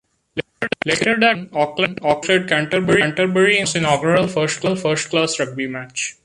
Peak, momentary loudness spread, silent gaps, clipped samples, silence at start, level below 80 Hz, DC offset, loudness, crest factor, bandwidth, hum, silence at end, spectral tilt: -2 dBFS; 10 LU; none; under 0.1%; 0.35 s; -54 dBFS; under 0.1%; -18 LUFS; 16 dB; 11.5 kHz; none; 0.15 s; -4 dB/octave